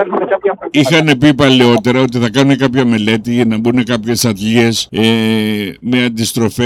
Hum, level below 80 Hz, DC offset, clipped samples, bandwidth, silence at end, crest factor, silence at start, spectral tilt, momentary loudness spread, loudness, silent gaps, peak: none; -46 dBFS; under 0.1%; under 0.1%; 16 kHz; 0 s; 12 dB; 0 s; -5 dB/octave; 6 LU; -12 LUFS; none; 0 dBFS